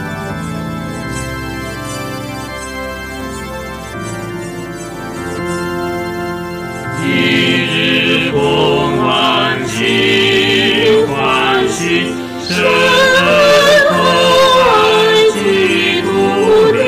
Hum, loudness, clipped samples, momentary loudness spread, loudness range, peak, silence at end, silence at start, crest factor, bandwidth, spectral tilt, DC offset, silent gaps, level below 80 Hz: none; -12 LUFS; under 0.1%; 15 LU; 14 LU; -4 dBFS; 0 s; 0 s; 10 dB; 16 kHz; -4 dB/octave; under 0.1%; none; -40 dBFS